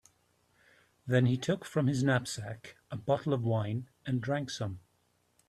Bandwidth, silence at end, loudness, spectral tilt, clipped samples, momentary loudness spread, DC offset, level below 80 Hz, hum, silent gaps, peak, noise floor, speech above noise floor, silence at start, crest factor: 12.5 kHz; 0.7 s; -32 LUFS; -6.5 dB/octave; under 0.1%; 15 LU; under 0.1%; -66 dBFS; none; none; -14 dBFS; -73 dBFS; 42 dB; 1.05 s; 20 dB